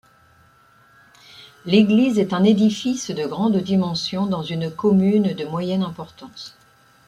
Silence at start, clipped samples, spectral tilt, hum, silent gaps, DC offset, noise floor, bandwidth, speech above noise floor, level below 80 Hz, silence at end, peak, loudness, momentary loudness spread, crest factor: 1.4 s; under 0.1%; -6.5 dB/octave; none; none; under 0.1%; -54 dBFS; 10.5 kHz; 35 dB; -60 dBFS; 0.6 s; -4 dBFS; -20 LUFS; 20 LU; 18 dB